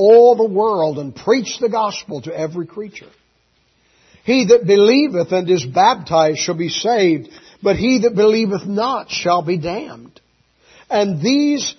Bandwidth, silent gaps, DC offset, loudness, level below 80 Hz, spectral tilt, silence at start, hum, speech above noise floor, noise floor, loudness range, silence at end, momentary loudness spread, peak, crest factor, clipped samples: 6.4 kHz; none; under 0.1%; -16 LUFS; -52 dBFS; -5 dB/octave; 0 s; none; 45 dB; -60 dBFS; 6 LU; 0.05 s; 13 LU; 0 dBFS; 16 dB; under 0.1%